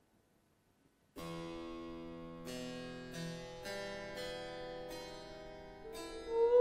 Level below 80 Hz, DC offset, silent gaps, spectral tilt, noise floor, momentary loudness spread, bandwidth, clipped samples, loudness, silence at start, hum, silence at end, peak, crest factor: -62 dBFS; under 0.1%; none; -5 dB/octave; -74 dBFS; 8 LU; 16 kHz; under 0.1%; -44 LUFS; 1.15 s; none; 0 s; -20 dBFS; 22 dB